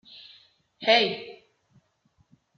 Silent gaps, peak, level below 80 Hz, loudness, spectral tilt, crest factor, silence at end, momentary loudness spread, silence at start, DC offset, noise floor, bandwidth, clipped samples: none; -8 dBFS; -78 dBFS; -23 LUFS; -3.5 dB/octave; 22 dB; 1.25 s; 26 LU; 0.8 s; under 0.1%; -68 dBFS; 6.6 kHz; under 0.1%